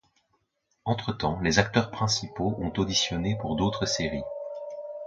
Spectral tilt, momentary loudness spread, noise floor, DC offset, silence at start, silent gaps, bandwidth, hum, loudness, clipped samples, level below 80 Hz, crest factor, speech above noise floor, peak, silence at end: -4.5 dB/octave; 13 LU; -75 dBFS; under 0.1%; 0.85 s; none; 9.2 kHz; none; -28 LUFS; under 0.1%; -48 dBFS; 26 dB; 48 dB; -4 dBFS; 0 s